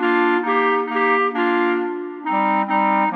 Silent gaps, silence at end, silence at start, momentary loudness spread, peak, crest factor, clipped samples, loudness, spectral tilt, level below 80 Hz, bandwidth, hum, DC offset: none; 0 s; 0 s; 6 LU; -6 dBFS; 12 dB; under 0.1%; -19 LUFS; -7.5 dB/octave; under -90 dBFS; 5 kHz; none; under 0.1%